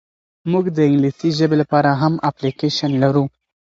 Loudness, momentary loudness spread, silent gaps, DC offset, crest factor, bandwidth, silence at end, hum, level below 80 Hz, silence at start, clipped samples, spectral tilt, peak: -17 LUFS; 6 LU; none; under 0.1%; 16 dB; 7.8 kHz; 0.35 s; none; -58 dBFS; 0.45 s; under 0.1%; -7 dB/octave; -2 dBFS